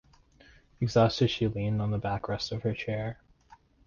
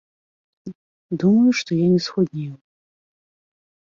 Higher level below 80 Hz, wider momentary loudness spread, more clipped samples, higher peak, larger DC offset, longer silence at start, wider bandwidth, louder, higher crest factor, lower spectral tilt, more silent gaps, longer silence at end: first, -52 dBFS vs -64 dBFS; second, 10 LU vs 23 LU; neither; second, -12 dBFS vs -8 dBFS; neither; first, 0.8 s vs 0.65 s; about the same, 7.2 kHz vs 7.6 kHz; second, -29 LUFS vs -19 LUFS; about the same, 18 dB vs 16 dB; about the same, -6.5 dB/octave vs -6.5 dB/octave; second, none vs 0.75-1.09 s; second, 0.3 s vs 1.3 s